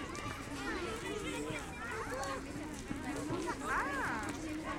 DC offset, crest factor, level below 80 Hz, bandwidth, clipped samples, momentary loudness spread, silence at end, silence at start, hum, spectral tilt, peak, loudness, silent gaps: under 0.1%; 16 dB; -54 dBFS; 16.5 kHz; under 0.1%; 6 LU; 0 s; 0 s; none; -4 dB/octave; -24 dBFS; -39 LUFS; none